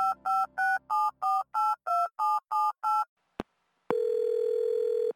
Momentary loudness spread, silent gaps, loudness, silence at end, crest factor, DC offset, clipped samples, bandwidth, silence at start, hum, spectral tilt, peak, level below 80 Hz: 8 LU; 3.09-3.17 s; -29 LUFS; 0.05 s; 16 dB; under 0.1%; under 0.1%; 17 kHz; 0 s; none; -4 dB/octave; -12 dBFS; -70 dBFS